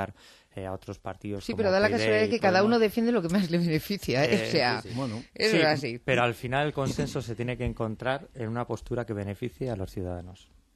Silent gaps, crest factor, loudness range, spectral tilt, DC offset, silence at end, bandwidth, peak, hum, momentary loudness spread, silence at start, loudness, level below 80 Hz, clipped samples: none; 18 dB; 8 LU; -5.5 dB/octave; under 0.1%; 0.4 s; 13 kHz; -10 dBFS; none; 14 LU; 0 s; -27 LUFS; -52 dBFS; under 0.1%